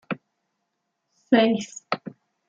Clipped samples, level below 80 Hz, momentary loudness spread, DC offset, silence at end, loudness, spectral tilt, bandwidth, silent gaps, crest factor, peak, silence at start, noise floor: under 0.1%; -72 dBFS; 16 LU; under 0.1%; 0.4 s; -23 LUFS; -5 dB/octave; 7.8 kHz; none; 22 dB; -6 dBFS; 0.1 s; -78 dBFS